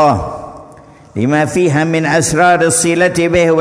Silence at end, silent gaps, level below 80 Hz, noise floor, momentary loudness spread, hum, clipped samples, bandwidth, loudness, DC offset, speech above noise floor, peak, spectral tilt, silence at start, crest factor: 0 s; none; -38 dBFS; -39 dBFS; 15 LU; none; under 0.1%; 11 kHz; -12 LUFS; under 0.1%; 27 dB; 0 dBFS; -4.5 dB/octave; 0 s; 12 dB